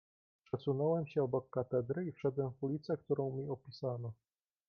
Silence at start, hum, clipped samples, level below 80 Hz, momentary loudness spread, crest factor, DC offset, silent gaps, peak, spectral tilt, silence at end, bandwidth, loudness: 0.55 s; none; under 0.1%; -72 dBFS; 8 LU; 16 dB; under 0.1%; none; -22 dBFS; -8.5 dB/octave; 0.55 s; 6.4 kHz; -38 LUFS